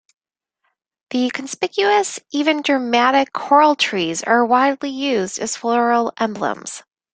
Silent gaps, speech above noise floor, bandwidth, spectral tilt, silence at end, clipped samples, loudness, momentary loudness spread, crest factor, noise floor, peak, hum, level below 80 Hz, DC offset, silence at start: none; 58 dB; 9.6 kHz; -3 dB/octave; 0.35 s; under 0.1%; -18 LUFS; 10 LU; 18 dB; -75 dBFS; 0 dBFS; none; -66 dBFS; under 0.1%; 1.1 s